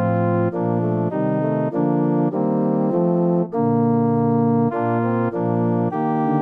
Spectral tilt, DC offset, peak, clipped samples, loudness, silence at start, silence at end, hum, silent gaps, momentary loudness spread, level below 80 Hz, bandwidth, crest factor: -12 dB/octave; under 0.1%; -8 dBFS; under 0.1%; -20 LUFS; 0 s; 0 s; none; none; 3 LU; -66 dBFS; 3.7 kHz; 12 dB